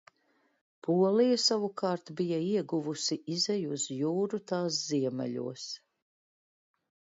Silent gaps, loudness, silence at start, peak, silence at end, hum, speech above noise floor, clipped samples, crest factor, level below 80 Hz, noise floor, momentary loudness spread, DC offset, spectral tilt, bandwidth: none; -30 LUFS; 0.85 s; -14 dBFS; 1.4 s; none; 42 dB; under 0.1%; 18 dB; -82 dBFS; -72 dBFS; 12 LU; under 0.1%; -4.5 dB/octave; 7.8 kHz